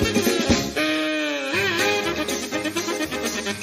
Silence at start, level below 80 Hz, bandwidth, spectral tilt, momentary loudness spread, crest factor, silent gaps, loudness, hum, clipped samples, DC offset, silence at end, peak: 0 s; -42 dBFS; 15.5 kHz; -3 dB/octave; 5 LU; 18 dB; none; -22 LUFS; none; under 0.1%; under 0.1%; 0 s; -4 dBFS